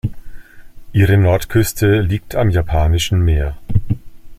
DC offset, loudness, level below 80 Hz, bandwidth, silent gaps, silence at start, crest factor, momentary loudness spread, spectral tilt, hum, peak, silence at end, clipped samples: under 0.1%; -16 LUFS; -26 dBFS; 15.5 kHz; none; 0.05 s; 14 dB; 8 LU; -6 dB/octave; none; -2 dBFS; 0.05 s; under 0.1%